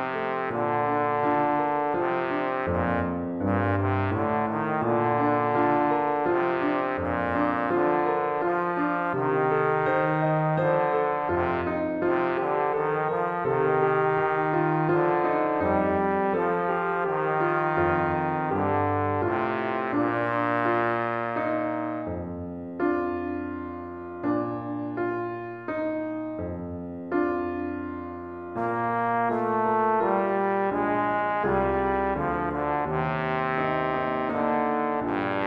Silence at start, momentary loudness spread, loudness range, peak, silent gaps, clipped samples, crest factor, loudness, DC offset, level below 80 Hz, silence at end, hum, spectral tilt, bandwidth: 0 s; 8 LU; 6 LU; -10 dBFS; none; under 0.1%; 16 dB; -26 LUFS; under 0.1%; -52 dBFS; 0 s; none; -9.5 dB/octave; 5.4 kHz